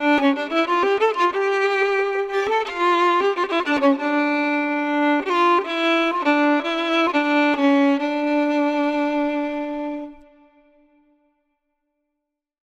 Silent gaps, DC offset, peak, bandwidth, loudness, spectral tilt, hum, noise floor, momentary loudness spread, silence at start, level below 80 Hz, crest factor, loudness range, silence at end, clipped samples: none; under 0.1%; -6 dBFS; 8.2 kHz; -20 LUFS; -3.5 dB/octave; none; -80 dBFS; 5 LU; 0 s; -58 dBFS; 14 dB; 8 LU; 2.5 s; under 0.1%